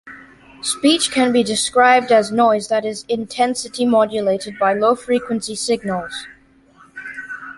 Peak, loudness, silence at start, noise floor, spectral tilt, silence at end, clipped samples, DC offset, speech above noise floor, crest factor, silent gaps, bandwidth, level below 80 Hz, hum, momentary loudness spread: 0 dBFS; -17 LUFS; 0.05 s; -50 dBFS; -3 dB/octave; 0 s; under 0.1%; under 0.1%; 33 dB; 18 dB; none; 11.5 kHz; -58 dBFS; none; 15 LU